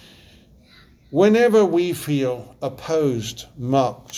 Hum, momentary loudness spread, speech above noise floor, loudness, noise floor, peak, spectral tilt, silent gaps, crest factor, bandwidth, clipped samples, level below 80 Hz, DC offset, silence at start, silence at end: none; 15 LU; 31 dB; -20 LUFS; -51 dBFS; -4 dBFS; -6 dB/octave; none; 18 dB; 15 kHz; under 0.1%; -54 dBFS; under 0.1%; 1.1 s; 0 s